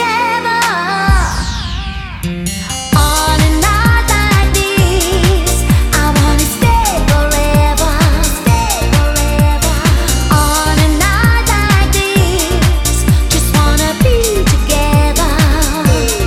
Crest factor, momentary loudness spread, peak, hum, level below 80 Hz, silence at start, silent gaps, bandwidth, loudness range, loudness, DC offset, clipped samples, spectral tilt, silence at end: 10 dB; 3 LU; 0 dBFS; none; -14 dBFS; 0 s; none; 16.5 kHz; 2 LU; -12 LUFS; under 0.1%; under 0.1%; -4.5 dB/octave; 0 s